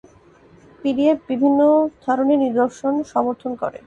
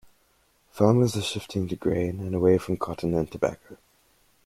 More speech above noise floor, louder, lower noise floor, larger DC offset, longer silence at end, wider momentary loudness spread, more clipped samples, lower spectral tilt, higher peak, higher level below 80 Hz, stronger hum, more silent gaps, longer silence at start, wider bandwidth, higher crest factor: second, 31 dB vs 40 dB; first, -19 LUFS vs -25 LUFS; second, -50 dBFS vs -65 dBFS; neither; second, 0.1 s vs 0.7 s; about the same, 9 LU vs 9 LU; neither; about the same, -6.5 dB/octave vs -6.5 dB/octave; about the same, -6 dBFS vs -6 dBFS; second, -60 dBFS vs -54 dBFS; neither; neither; about the same, 0.85 s vs 0.75 s; second, 8 kHz vs 15.5 kHz; second, 14 dB vs 20 dB